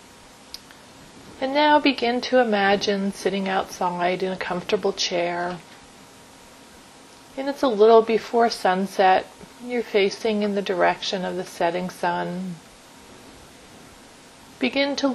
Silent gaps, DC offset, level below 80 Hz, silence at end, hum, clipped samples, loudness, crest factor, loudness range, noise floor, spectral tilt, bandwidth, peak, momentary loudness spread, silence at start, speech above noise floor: none; under 0.1%; -60 dBFS; 0 s; none; under 0.1%; -22 LUFS; 22 dB; 8 LU; -47 dBFS; -4.5 dB/octave; 13.5 kHz; -2 dBFS; 13 LU; 0.55 s; 26 dB